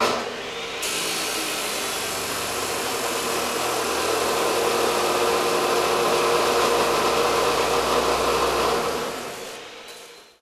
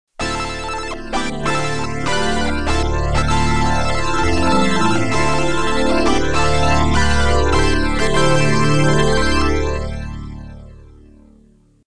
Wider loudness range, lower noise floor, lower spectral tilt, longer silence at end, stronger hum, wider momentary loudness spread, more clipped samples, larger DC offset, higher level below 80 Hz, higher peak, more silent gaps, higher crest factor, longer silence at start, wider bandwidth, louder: about the same, 4 LU vs 4 LU; second, -44 dBFS vs -51 dBFS; second, -2 dB/octave vs -5 dB/octave; first, 0.2 s vs 0 s; neither; about the same, 10 LU vs 9 LU; neither; second, under 0.1% vs 10%; second, -50 dBFS vs -24 dBFS; second, -8 dBFS vs 0 dBFS; neither; about the same, 16 dB vs 16 dB; about the same, 0 s vs 0.05 s; first, 16 kHz vs 10.5 kHz; second, -22 LUFS vs -17 LUFS